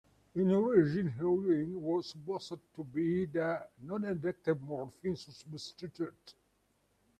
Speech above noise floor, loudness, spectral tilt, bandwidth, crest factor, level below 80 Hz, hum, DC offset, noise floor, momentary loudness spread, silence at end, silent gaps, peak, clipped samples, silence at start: 41 dB; -34 LUFS; -7.5 dB/octave; 9.8 kHz; 20 dB; -70 dBFS; none; under 0.1%; -75 dBFS; 16 LU; 0.9 s; none; -14 dBFS; under 0.1%; 0.35 s